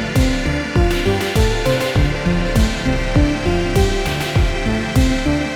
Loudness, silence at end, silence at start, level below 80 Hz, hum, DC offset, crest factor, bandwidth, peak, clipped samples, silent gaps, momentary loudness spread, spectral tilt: -17 LUFS; 0 s; 0 s; -22 dBFS; none; under 0.1%; 14 dB; 19 kHz; -2 dBFS; under 0.1%; none; 2 LU; -5.5 dB/octave